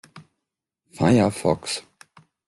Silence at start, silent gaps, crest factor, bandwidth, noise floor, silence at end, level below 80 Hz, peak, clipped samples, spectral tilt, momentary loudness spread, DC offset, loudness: 0.15 s; none; 20 dB; 12.5 kHz; -83 dBFS; 0.7 s; -56 dBFS; -4 dBFS; under 0.1%; -6 dB/octave; 12 LU; under 0.1%; -22 LUFS